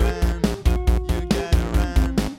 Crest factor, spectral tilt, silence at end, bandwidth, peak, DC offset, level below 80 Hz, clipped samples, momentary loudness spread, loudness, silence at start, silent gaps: 14 dB; -6.5 dB/octave; 0 s; 15.5 kHz; -6 dBFS; under 0.1%; -22 dBFS; under 0.1%; 2 LU; -22 LUFS; 0 s; none